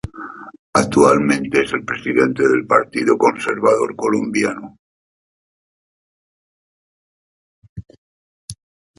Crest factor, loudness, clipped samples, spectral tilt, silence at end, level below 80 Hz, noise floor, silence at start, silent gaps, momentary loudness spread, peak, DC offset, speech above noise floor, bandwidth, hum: 20 dB; -16 LUFS; under 0.1%; -5 dB/octave; 0.45 s; -50 dBFS; under -90 dBFS; 0.05 s; 0.59-0.73 s, 4.79-7.62 s, 7.69-7.76 s, 7.98-8.48 s; 20 LU; 0 dBFS; under 0.1%; over 74 dB; 11.5 kHz; none